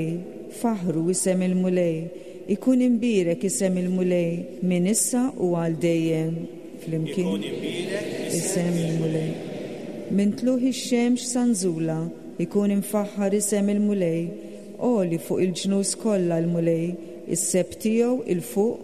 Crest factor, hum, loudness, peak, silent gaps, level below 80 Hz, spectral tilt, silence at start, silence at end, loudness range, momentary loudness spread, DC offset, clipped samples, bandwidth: 14 dB; none; -24 LUFS; -10 dBFS; none; -64 dBFS; -5.5 dB/octave; 0 s; 0 s; 3 LU; 9 LU; 0.3%; under 0.1%; 13.5 kHz